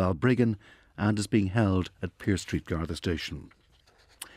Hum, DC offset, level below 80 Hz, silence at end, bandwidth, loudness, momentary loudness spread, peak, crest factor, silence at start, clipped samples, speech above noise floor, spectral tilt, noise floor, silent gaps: none; under 0.1%; -48 dBFS; 0.1 s; 15.5 kHz; -29 LUFS; 13 LU; -10 dBFS; 18 dB; 0 s; under 0.1%; 34 dB; -6.5 dB/octave; -62 dBFS; none